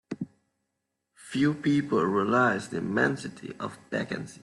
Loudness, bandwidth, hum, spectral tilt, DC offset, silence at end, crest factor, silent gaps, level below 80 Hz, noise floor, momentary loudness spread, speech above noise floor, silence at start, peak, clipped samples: -27 LUFS; 12 kHz; none; -6 dB/octave; under 0.1%; 0.05 s; 20 dB; none; -68 dBFS; -82 dBFS; 15 LU; 55 dB; 0.1 s; -10 dBFS; under 0.1%